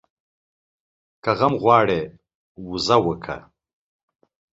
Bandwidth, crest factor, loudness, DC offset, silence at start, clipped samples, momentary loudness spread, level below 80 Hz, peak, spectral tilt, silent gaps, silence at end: 8 kHz; 22 dB; -20 LUFS; under 0.1%; 1.25 s; under 0.1%; 18 LU; -54 dBFS; -2 dBFS; -5.5 dB/octave; 2.35-2.55 s; 1.15 s